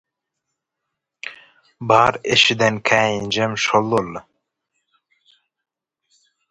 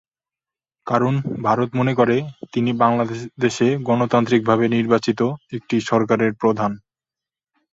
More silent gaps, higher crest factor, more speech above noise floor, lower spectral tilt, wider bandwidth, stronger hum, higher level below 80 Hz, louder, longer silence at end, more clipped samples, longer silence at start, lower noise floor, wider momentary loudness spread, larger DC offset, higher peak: neither; about the same, 22 dB vs 18 dB; second, 63 dB vs over 71 dB; second, -3.5 dB/octave vs -6.5 dB/octave; first, 11.5 kHz vs 7.8 kHz; neither; about the same, -56 dBFS vs -58 dBFS; about the same, -17 LUFS vs -19 LUFS; first, 2.3 s vs 0.95 s; neither; first, 1.25 s vs 0.85 s; second, -81 dBFS vs under -90 dBFS; first, 20 LU vs 6 LU; neither; about the same, 0 dBFS vs -2 dBFS